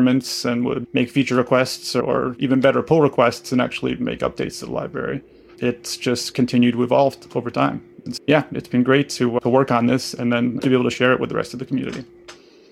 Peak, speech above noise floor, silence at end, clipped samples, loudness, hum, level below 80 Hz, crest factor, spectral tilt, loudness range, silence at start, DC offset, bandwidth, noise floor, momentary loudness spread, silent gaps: -2 dBFS; 25 dB; 0.35 s; under 0.1%; -20 LUFS; none; -54 dBFS; 18 dB; -5.5 dB/octave; 3 LU; 0 s; under 0.1%; 14.5 kHz; -45 dBFS; 9 LU; none